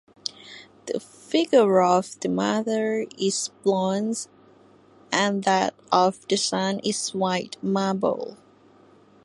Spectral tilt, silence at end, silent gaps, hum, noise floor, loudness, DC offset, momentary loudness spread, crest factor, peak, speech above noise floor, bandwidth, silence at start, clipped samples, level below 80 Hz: -4 dB/octave; 0.9 s; none; none; -54 dBFS; -24 LUFS; under 0.1%; 14 LU; 20 dB; -4 dBFS; 31 dB; 11.5 kHz; 0.25 s; under 0.1%; -70 dBFS